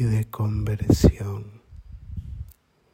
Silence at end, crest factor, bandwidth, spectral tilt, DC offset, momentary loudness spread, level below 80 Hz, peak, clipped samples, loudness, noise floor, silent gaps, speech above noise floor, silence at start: 0.5 s; 20 dB; 16.5 kHz; -7.5 dB/octave; under 0.1%; 24 LU; -34 dBFS; -4 dBFS; under 0.1%; -23 LUFS; -51 dBFS; none; 30 dB; 0 s